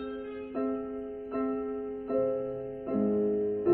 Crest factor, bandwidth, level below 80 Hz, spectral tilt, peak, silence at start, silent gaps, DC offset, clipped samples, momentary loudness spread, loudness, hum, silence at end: 18 dB; 4.3 kHz; -60 dBFS; -11 dB/octave; -12 dBFS; 0 s; none; under 0.1%; under 0.1%; 10 LU; -32 LUFS; none; 0 s